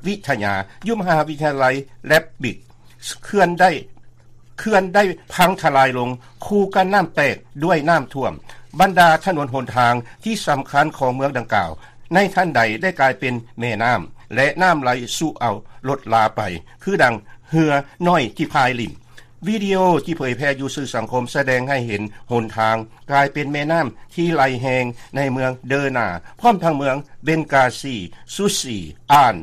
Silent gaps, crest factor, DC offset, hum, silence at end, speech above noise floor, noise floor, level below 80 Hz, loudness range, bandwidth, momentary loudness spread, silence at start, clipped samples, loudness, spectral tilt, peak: none; 18 dB; under 0.1%; none; 0 s; 25 dB; -43 dBFS; -48 dBFS; 3 LU; 15 kHz; 11 LU; 0 s; under 0.1%; -19 LUFS; -5 dB/octave; 0 dBFS